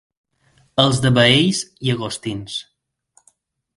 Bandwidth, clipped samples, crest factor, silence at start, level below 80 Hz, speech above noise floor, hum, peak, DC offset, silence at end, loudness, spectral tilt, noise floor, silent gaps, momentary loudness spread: 11.5 kHz; under 0.1%; 20 dB; 0.75 s; -50 dBFS; 43 dB; none; 0 dBFS; under 0.1%; 1.15 s; -17 LUFS; -4.5 dB/octave; -60 dBFS; none; 15 LU